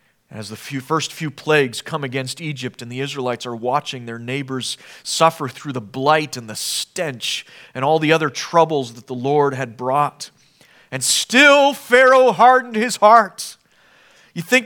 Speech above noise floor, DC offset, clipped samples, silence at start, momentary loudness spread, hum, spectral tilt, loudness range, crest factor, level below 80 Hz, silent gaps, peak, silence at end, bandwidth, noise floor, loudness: 36 dB; under 0.1%; under 0.1%; 0.3 s; 18 LU; none; -3.5 dB/octave; 9 LU; 18 dB; -70 dBFS; none; 0 dBFS; 0 s; 19.5 kHz; -53 dBFS; -17 LUFS